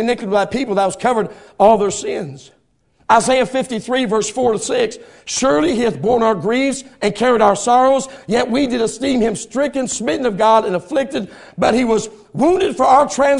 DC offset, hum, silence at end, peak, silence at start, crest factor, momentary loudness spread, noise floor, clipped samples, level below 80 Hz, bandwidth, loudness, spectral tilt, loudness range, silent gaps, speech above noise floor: under 0.1%; none; 0 s; 0 dBFS; 0 s; 16 dB; 9 LU; -59 dBFS; under 0.1%; -48 dBFS; 11 kHz; -16 LUFS; -4 dB/octave; 2 LU; none; 43 dB